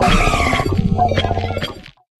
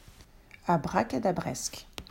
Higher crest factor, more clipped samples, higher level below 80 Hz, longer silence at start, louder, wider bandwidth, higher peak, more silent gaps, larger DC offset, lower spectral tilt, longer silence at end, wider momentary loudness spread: second, 14 dB vs 20 dB; neither; first, -24 dBFS vs -54 dBFS; about the same, 0 s vs 0.05 s; first, -17 LUFS vs -30 LUFS; second, 13.5 kHz vs 16 kHz; first, -2 dBFS vs -12 dBFS; neither; neither; about the same, -5.5 dB/octave vs -5 dB/octave; first, 0.3 s vs 0.05 s; about the same, 11 LU vs 10 LU